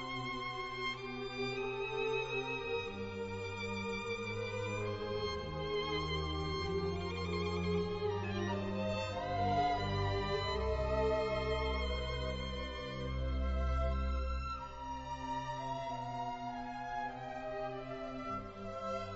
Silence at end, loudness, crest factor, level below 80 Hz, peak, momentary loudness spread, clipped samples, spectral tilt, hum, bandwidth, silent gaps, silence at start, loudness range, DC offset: 0 s; -38 LUFS; 16 dB; -44 dBFS; -22 dBFS; 7 LU; under 0.1%; -4 dB/octave; none; 7.6 kHz; none; 0 s; 6 LU; under 0.1%